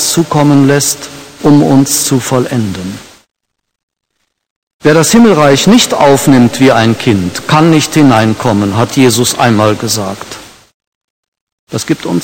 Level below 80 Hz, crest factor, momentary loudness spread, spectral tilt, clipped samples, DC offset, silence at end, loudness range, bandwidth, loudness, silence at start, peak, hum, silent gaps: -42 dBFS; 10 dB; 14 LU; -4.5 dB/octave; 2%; under 0.1%; 0 s; 6 LU; 17.5 kHz; -8 LUFS; 0 s; 0 dBFS; none; 3.83-3.88 s, 4.50-4.67 s, 4.74-4.79 s, 10.74-10.80 s, 10.87-11.32 s, 11.41-11.67 s